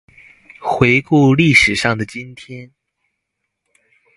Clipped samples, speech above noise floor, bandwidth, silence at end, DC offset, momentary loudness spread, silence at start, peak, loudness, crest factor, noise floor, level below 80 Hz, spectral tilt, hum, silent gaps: under 0.1%; 61 dB; 11.5 kHz; 1.5 s; under 0.1%; 23 LU; 0.6 s; 0 dBFS; -13 LUFS; 18 dB; -75 dBFS; -44 dBFS; -5.5 dB/octave; none; none